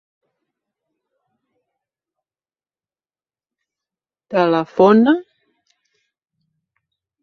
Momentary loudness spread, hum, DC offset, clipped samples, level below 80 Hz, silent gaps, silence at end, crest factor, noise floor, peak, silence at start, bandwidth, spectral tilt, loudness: 9 LU; none; under 0.1%; under 0.1%; -66 dBFS; none; 2 s; 20 dB; under -90 dBFS; -2 dBFS; 4.3 s; 6.4 kHz; -8 dB/octave; -15 LUFS